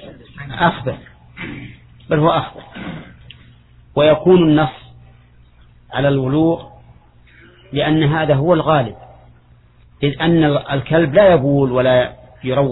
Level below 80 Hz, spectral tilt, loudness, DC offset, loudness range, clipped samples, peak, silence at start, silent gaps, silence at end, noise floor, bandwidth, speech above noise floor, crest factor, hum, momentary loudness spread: -44 dBFS; -10.5 dB/octave; -15 LUFS; under 0.1%; 6 LU; under 0.1%; 0 dBFS; 0 s; none; 0 s; -48 dBFS; 4.1 kHz; 34 dB; 16 dB; 60 Hz at -40 dBFS; 19 LU